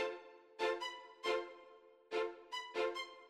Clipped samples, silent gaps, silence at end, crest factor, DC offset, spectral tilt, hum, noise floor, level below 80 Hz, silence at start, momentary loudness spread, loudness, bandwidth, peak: under 0.1%; none; 0 s; 18 dB; under 0.1%; -1.5 dB/octave; none; -62 dBFS; -84 dBFS; 0 s; 15 LU; -41 LUFS; 14 kHz; -24 dBFS